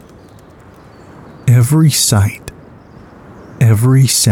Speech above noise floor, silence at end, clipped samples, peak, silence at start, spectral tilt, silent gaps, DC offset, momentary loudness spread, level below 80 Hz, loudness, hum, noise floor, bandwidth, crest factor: 29 dB; 0 s; under 0.1%; 0 dBFS; 1.45 s; -4.5 dB/octave; none; under 0.1%; 11 LU; -44 dBFS; -11 LUFS; none; -39 dBFS; 17 kHz; 14 dB